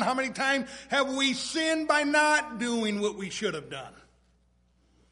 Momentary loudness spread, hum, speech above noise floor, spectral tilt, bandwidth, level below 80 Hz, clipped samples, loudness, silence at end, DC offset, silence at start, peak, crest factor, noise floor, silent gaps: 11 LU; 60 Hz at -65 dBFS; 38 dB; -2.5 dB/octave; 11.5 kHz; -64 dBFS; under 0.1%; -27 LUFS; 1.2 s; under 0.1%; 0 s; -10 dBFS; 20 dB; -66 dBFS; none